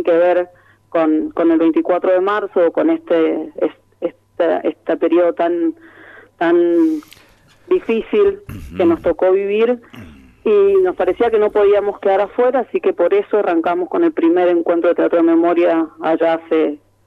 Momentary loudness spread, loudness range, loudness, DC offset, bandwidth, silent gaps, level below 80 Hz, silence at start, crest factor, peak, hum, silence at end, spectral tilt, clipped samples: 8 LU; 3 LU; -16 LUFS; under 0.1%; 4.4 kHz; none; -50 dBFS; 0 s; 12 dB; -4 dBFS; none; 0.3 s; -7.5 dB/octave; under 0.1%